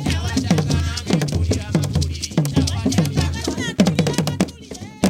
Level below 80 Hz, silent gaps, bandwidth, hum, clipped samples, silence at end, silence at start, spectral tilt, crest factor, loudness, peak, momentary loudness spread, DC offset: -32 dBFS; none; 17 kHz; none; under 0.1%; 0 s; 0 s; -5.5 dB/octave; 18 dB; -20 LUFS; 0 dBFS; 5 LU; under 0.1%